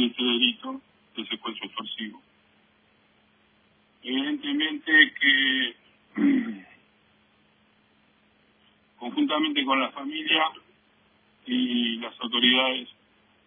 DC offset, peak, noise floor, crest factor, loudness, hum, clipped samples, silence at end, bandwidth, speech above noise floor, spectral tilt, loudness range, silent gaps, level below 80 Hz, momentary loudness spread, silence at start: under 0.1%; -6 dBFS; -63 dBFS; 22 dB; -24 LUFS; none; under 0.1%; 0.55 s; 3.7 kHz; 38 dB; -6 dB/octave; 12 LU; none; -78 dBFS; 19 LU; 0 s